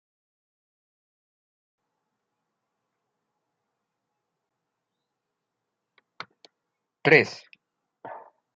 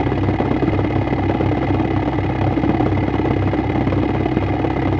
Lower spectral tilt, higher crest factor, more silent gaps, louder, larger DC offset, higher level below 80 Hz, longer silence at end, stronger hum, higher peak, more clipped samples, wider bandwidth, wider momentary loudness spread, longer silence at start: second, -3 dB/octave vs -9.5 dB/octave; first, 32 dB vs 16 dB; neither; second, -21 LUFS vs -18 LUFS; neither; second, -82 dBFS vs -30 dBFS; first, 0.4 s vs 0 s; neither; about the same, -2 dBFS vs -2 dBFS; neither; first, 7.4 kHz vs 6.6 kHz; first, 26 LU vs 1 LU; first, 7.05 s vs 0 s